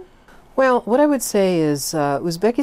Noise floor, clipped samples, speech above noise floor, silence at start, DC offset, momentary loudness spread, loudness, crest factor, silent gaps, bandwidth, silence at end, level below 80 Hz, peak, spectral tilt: -47 dBFS; under 0.1%; 29 dB; 0 s; under 0.1%; 4 LU; -18 LUFS; 12 dB; none; 16 kHz; 0 s; -50 dBFS; -6 dBFS; -5 dB/octave